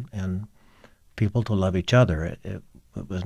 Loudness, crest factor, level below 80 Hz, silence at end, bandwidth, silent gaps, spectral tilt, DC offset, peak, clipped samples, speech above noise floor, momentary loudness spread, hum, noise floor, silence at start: -24 LUFS; 18 dB; -46 dBFS; 0 s; 9 kHz; none; -7 dB/octave; under 0.1%; -8 dBFS; under 0.1%; 31 dB; 21 LU; none; -54 dBFS; 0 s